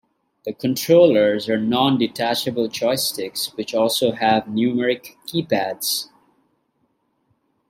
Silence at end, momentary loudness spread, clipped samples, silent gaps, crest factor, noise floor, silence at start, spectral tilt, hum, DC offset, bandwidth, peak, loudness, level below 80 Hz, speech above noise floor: 1.65 s; 11 LU; under 0.1%; none; 18 dB; -68 dBFS; 0.45 s; -4 dB/octave; none; under 0.1%; 16.5 kHz; -2 dBFS; -20 LUFS; -64 dBFS; 49 dB